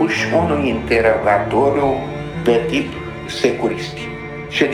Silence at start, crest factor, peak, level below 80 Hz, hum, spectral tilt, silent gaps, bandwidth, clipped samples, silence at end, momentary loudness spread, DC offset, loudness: 0 s; 18 dB; 0 dBFS; -40 dBFS; none; -5.5 dB/octave; none; 15 kHz; under 0.1%; 0 s; 11 LU; under 0.1%; -18 LUFS